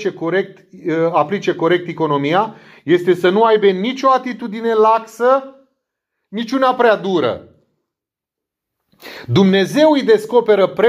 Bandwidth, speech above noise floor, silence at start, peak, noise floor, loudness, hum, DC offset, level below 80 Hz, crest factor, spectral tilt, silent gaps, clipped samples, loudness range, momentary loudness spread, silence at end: 15 kHz; 69 dB; 0 s; 0 dBFS; -84 dBFS; -15 LUFS; none; under 0.1%; -66 dBFS; 16 dB; -6.5 dB/octave; none; under 0.1%; 5 LU; 12 LU; 0 s